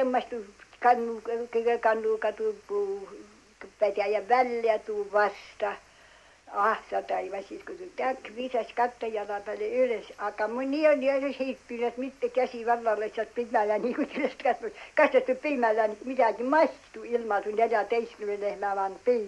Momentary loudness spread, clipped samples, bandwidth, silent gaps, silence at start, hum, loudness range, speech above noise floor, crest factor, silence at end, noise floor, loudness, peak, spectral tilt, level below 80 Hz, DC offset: 10 LU; under 0.1%; 11.5 kHz; none; 0 s; none; 5 LU; 28 dB; 18 dB; 0 s; -56 dBFS; -28 LUFS; -10 dBFS; -4.5 dB/octave; -68 dBFS; under 0.1%